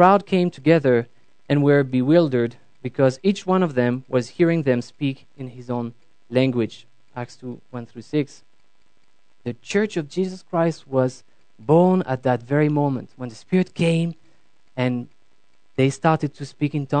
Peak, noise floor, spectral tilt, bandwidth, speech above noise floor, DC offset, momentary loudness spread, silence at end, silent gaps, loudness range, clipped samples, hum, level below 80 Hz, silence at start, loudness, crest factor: 0 dBFS; -66 dBFS; -7.5 dB/octave; 9.2 kHz; 46 dB; 0.4%; 17 LU; 0 s; none; 8 LU; under 0.1%; none; -66 dBFS; 0 s; -21 LUFS; 22 dB